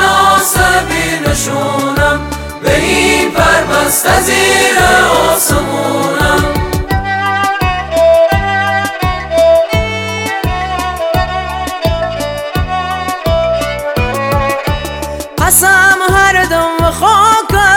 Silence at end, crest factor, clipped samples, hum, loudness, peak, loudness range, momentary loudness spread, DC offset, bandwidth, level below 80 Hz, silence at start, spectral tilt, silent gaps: 0 s; 10 dB; under 0.1%; none; -11 LUFS; 0 dBFS; 6 LU; 9 LU; under 0.1%; 19 kHz; -24 dBFS; 0 s; -3.5 dB/octave; none